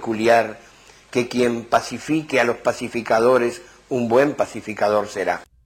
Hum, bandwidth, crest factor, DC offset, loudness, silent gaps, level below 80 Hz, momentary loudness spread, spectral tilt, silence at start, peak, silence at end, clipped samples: none; 16.5 kHz; 16 dB; under 0.1%; -20 LUFS; none; -58 dBFS; 9 LU; -5 dB/octave; 0 s; -4 dBFS; 0.2 s; under 0.1%